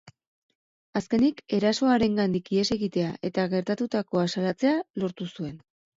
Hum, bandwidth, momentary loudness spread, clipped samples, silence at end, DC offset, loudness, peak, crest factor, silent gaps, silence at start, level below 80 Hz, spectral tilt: none; 7.8 kHz; 10 LU; under 0.1%; 0.4 s; under 0.1%; -26 LUFS; -10 dBFS; 16 dB; 0.27-0.49 s, 0.55-0.93 s, 4.90-4.94 s; 0.05 s; -60 dBFS; -6 dB/octave